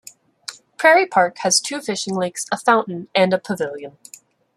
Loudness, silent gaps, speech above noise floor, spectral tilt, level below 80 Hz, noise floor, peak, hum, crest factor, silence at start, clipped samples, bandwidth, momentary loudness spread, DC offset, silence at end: -18 LUFS; none; 20 dB; -3 dB/octave; -68 dBFS; -39 dBFS; -2 dBFS; none; 18 dB; 0.5 s; under 0.1%; 14.5 kHz; 20 LU; under 0.1%; 0.7 s